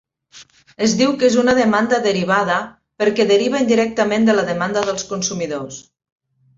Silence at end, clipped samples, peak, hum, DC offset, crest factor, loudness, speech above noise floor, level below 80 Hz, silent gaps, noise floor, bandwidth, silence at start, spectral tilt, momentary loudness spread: 0.75 s; under 0.1%; -2 dBFS; none; under 0.1%; 16 dB; -17 LUFS; 29 dB; -56 dBFS; none; -46 dBFS; 7.8 kHz; 0.35 s; -4 dB/octave; 9 LU